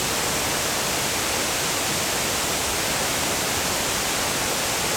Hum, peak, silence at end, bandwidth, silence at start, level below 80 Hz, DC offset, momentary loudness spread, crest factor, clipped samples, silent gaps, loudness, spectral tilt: none; -10 dBFS; 0 s; over 20 kHz; 0 s; -46 dBFS; under 0.1%; 0 LU; 14 dB; under 0.1%; none; -22 LUFS; -1.5 dB/octave